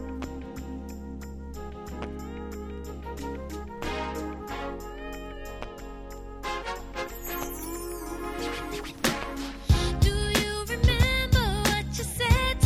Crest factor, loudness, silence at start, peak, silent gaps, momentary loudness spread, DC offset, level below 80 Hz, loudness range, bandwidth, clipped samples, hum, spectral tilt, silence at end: 22 dB; -30 LUFS; 0 s; -6 dBFS; none; 16 LU; under 0.1%; -34 dBFS; 12 LU; 16.5 kHz; under 0.1%; none; -4.5 dB/octave; 0 s